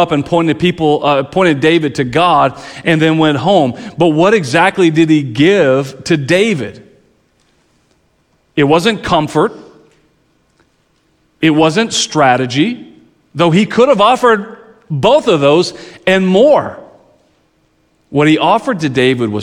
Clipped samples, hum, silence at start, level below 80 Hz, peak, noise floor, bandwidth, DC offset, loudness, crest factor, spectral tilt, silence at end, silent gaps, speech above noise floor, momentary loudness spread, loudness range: under 0.1%; none; 0 s; -48 dBFS; 0 dBFS; -57 dBFS; 12 kHz; under 0.1%; -11 LUFS; 12 dB; -5.5 dB/octave; 0 s; none; 46 dB; 7 LU; 6 LU